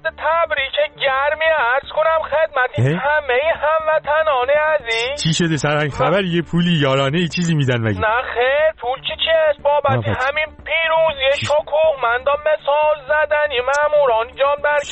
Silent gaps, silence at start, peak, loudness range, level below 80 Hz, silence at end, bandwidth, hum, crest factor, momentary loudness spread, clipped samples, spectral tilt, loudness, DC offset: none; 0.05 s; -6 dBFS; 1 LU; -46 dBFS; 0 s; 8.6 kHz; none; 12 dB; 3 LU; under 0.1%; -5 dB/octave; -17 LUFS; under 0.1%